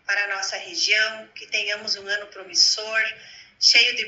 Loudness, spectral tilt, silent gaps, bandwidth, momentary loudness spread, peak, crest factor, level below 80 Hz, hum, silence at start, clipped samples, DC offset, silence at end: -20 LUFS; 2.5 dB/octave; none; 11 kHz; 12 LU; -2 dBFS; 20 dB; -74 dBFS; none; 0.1 s; under 0.1%; under 0.1%; 0 s